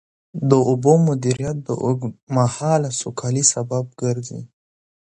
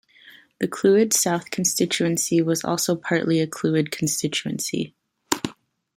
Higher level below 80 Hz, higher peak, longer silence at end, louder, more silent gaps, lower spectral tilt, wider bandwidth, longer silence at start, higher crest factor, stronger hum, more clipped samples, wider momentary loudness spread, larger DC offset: first, -54 dBFS vs -64 dBFS; about the same, -2 dBFS vs 0 dBFS; first, 0.6 s vs 0.45 s; about the same, -20 LUFS vs -22 LUFS; first, 2.23-2.27 s vs none; first, -5.5 dB/octave vs -4 dB/octave; second, 11 kHz vs 16.5 kHz; about the same, 0.35 s vs 0.25 s; second, 18 dB vs 24 dB; neither; neither; about the same, 10 LU vs 9 LU; neither